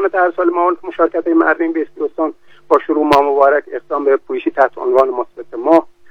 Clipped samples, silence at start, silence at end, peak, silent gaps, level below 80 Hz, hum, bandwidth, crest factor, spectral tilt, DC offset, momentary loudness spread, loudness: under 0.1%; 0 s; 0.25 s; 0 dBFS; none; -56 dBFS; none; 7.8 kHz; 14 dB; -6 dB/octave; 0.8%; 9 LU; -15 LUFS